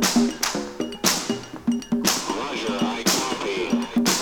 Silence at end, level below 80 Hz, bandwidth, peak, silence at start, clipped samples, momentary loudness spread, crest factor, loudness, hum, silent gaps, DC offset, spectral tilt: 0 s; -52 dBFS; over 20 kHz; -2 dBFS; 0 s; under 0.1%; 6 LU; 22 dB; -23 LUFS; none; none; under 0.1%; -2.5 dB/octave